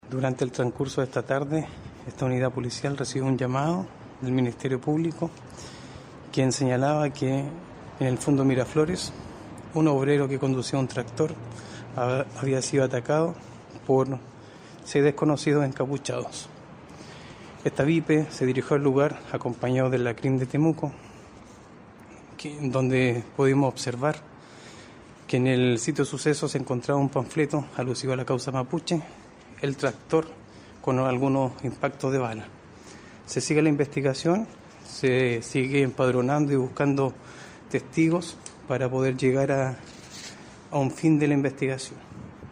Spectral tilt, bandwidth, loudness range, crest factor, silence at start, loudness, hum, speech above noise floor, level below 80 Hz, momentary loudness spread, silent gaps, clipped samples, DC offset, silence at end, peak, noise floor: -6 dB/octave; 11 kHz; 3 LU; 18 dB; 0.05 s; -26 LUFS; none; 23 dB; -58 dBFS; 20 LU; none; under 0.1%; under 0.1%; 0 s; -8 dBFS; -48 dBFS